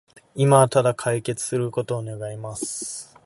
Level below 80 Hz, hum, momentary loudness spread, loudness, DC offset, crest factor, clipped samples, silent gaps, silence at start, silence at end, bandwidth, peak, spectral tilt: -62 dBFS; none; 16 LU; -23 LUFS; under 0.1%; 22 dB; under 0.1%; none; 0.35 s; 0.2 s; 12 kHz; -2 dBFS; -5.5 dB/octave